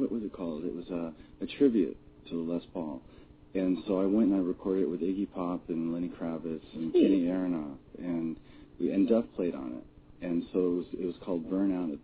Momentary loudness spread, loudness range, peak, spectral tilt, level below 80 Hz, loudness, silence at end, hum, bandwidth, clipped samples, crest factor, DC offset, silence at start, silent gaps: 14 LU; 3 LU; -12 dBFS; -7.5 dB/octave; -60 dBFS; -31 LUFS; 0.05 s; none; 4 kHz; under 0.1%; 18 dB; under 0.1%; 0 s; none